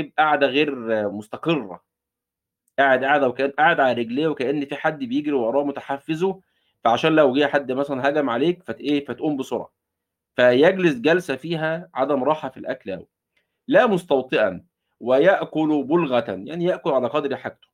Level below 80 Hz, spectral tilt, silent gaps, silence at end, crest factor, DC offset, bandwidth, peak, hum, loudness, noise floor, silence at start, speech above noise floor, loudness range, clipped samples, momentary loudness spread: -68 dBFS; -6.5 dB/octave; none; 0.2 s; 18 dB; under 0.1%; 12 kHz; -4 dBFS; none; -21 LUFS; -86 dBFS; 0 s; 65 dB; 2 LU; under 0.1%; 13 LU